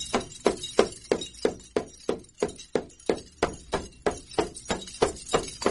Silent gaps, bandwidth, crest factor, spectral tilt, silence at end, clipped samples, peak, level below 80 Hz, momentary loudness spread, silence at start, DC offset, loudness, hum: none; 11.5 kHz; 28 dB; -3.5 dB/octave; 0 s; under 0.1%; -2 dBFS; -48 dBFS; 7 LU; 0 s; under 0.1%; -30 LUFS; none